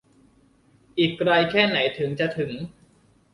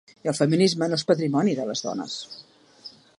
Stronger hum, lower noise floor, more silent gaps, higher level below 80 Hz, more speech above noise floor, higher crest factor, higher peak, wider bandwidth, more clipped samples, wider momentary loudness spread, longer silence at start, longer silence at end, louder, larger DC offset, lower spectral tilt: neither; first, -59 dBFS vs -48 dBFS; neither; first, -60 dBFS vs -72 dBFS; first, 36 dB vs 24 dB; about the same, 20 dB vs 18 dB; about the same, -6 dBFS vs -6 dBFS; about the same, 11 kHz vs 11.5 kHz; neither; second, 13 LU vs 23 LU; first, 0.95 s vs 0.25 s; first, 0.6 s vs 0.3 s; about the same, -22 LUFS vs -24 LUFS; neither; about the same, -6.5 dB/octave vs -5.5 dB/octave